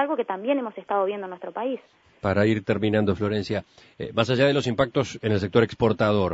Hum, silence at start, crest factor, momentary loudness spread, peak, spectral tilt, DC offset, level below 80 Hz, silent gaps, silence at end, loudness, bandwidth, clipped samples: none; 0 s; 18 dB; 10 LU; -4 dBFS; -6.5 dB/octave; under 0.1%; -54 dBFS; none; 0 s; -24 LUFS; 8 kHz; under 0.1%